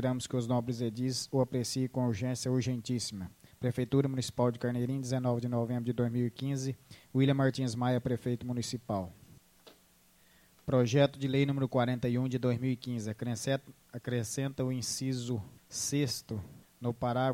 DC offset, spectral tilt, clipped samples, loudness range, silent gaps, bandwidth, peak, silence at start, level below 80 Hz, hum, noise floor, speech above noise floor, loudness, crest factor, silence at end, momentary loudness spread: under 0.1%; -6 dB/octave; under 0.1%; 4 LU; none; 16 kHz; -14 dBFS; 0 s; -64 dBFS; none; -65 dBFS; 33 dB; -33 LUFS; 18 dB; 0 s; 9 LU